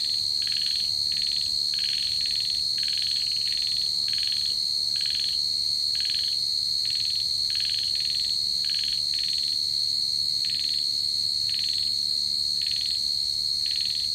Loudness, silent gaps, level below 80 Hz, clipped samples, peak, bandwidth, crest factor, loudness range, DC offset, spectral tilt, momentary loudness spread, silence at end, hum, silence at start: -23 LUFS; none; -58 dBFS; under 0.1%; -14 dBFS; 16.5 kHz; 12 dB; 0 LU; under 0.1%; 1 dB/octave; 0 LU; 0 s; none; 0 s